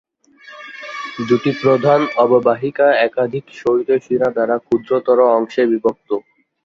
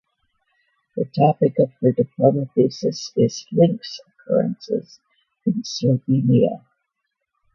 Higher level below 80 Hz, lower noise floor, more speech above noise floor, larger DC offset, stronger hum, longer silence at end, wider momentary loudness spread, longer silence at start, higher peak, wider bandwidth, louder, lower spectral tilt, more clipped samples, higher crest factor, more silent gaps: about the same, -60 dBFS vs -62 dBFS; second, -44 dBFS vs -78 dBFS; second, 28 dB vs 58 dB; neither; neither; second, 0.45 s vs 1 s; about the same, 12 LU vs 10 LU; second, 0.45 s vs 0.95 s; about the same, -2 dBFS vs -2 dBFS; about the same, 7.2 kHz vs 7.2 kHz; first, -16 LUFS vs -20 LUFS; about the same, -7 dB/octave vs -7.5 dB/octave; neither; about the same, 16 dB vs 20 dB; neither